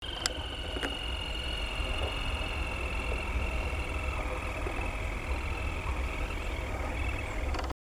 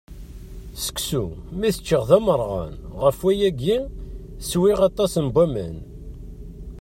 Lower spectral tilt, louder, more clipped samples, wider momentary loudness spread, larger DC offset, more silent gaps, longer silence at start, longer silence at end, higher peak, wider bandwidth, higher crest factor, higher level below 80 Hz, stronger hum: second, -4 dB/octave vs -5.5 dB/octave; second, -34 LUFS vs -21 LUFS; neither; second, 2 LU vs 22 LU; neither; neither; about the same, 0 s vs 0.1 s; first, 0.15 s vs 0 s; second, -8 dBFS vs -2 dBFS; first, 19.5 kHz vs 16.5 kHz; first, 26 dB vs 20 dB; about the same, -36 dBFS vs -38 dBFS; neither